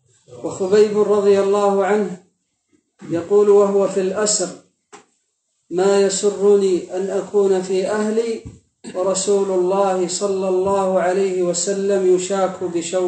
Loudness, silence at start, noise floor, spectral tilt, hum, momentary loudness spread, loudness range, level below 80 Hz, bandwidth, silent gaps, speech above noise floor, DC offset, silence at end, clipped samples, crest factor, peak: -18 LUFS; 0.3 s; -70 dBFS; -4.5 dB/octave; none; 10 LU; 2 LU; -62 dBFS; 9 kHz; none; 53 dB; under 0.1%; 0 s; under 0.1%; 16 dB; -2 dBFS